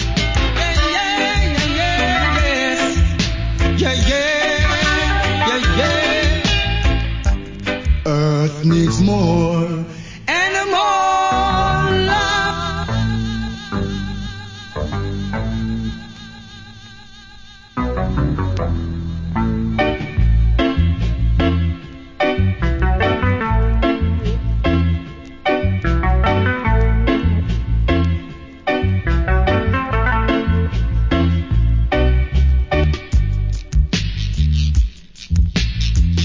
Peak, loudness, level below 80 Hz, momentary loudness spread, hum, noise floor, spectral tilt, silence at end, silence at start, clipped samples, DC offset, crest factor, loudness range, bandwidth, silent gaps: -2 dBFS; -18 LUFS; -20 dBFS; 9 LU; none; -39 dBFS; -5.5 dB/octave; 0 s; 0 s; under 0.1%; under 0.1%; 14 dB; 7 LU; 7.6 kHz; none